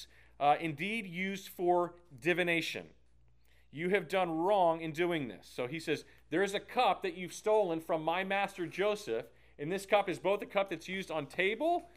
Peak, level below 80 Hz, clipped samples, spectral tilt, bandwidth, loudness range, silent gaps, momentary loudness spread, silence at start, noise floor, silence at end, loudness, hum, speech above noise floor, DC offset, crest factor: -14 dBFS; -68 dBFS; under 0.1%; -5 dB/octave; 15.5 kHz; 1 LU; none; 9 LU; 0 s; -68 dBFS; 0.1 s; -33 LUFS; none; 35 dB; under 0.1%; 18 dB